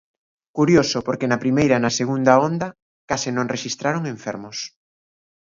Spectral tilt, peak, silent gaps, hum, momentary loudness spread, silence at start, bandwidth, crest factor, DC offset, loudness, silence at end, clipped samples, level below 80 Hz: -5 dB/octave; 0 dBFS; 2.82-3.08 s; none; 14 LU; 0.55 s; 7.6 kHz; 20 dB; under 0.1%; -20 LUFS; 0.9 s; under 0.1%; -56 dBFS